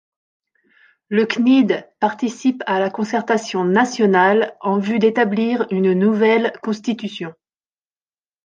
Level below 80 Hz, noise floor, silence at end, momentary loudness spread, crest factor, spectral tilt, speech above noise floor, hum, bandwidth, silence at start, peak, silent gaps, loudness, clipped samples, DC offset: -68 dBFS; under -90 dBFS; 1.15 s; 9 LU; 16 dB; -6 dB/octave; over 73 dB; none; 8.8 kHz; 1.1 s; -2 dBFS; none; -18 LUFS; under 0.1%; under 0.1%